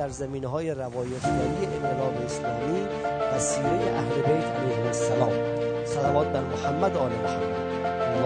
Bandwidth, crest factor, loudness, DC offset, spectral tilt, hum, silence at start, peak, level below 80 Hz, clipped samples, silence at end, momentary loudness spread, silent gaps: 9.6 kHz; 18 dB; -27 LUFS; under 0.1%; -5.5 dB/octave; none; 0 s; -8 dBFS; -50 dBFS; under 0.1%; 0 s; 5 LU; none